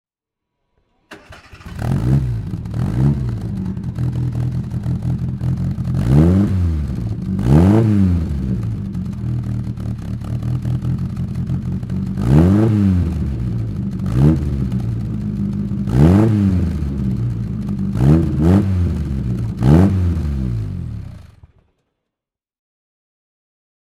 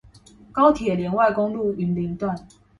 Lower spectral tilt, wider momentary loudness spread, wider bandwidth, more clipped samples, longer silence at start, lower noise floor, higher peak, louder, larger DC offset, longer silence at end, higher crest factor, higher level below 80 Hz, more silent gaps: first, -9.5 dB/octave vs -8 dB/octave; about the same, 11 LU vs 11 LU; first, 12.5 kHz vs 11 kHz; neither; first, 1.1 s vs 0.55 s; first, -85 dBFS vs -49 dBFS; about the same, 0 dBFS vs -2 dBFS; first, -18 LUFS vs -22 LUFS; neither; first, 2.55 s vs 0.35 s; about the same, 18 dB vs 20 dB; first, -28 dBFS vs -50 dBFS; neither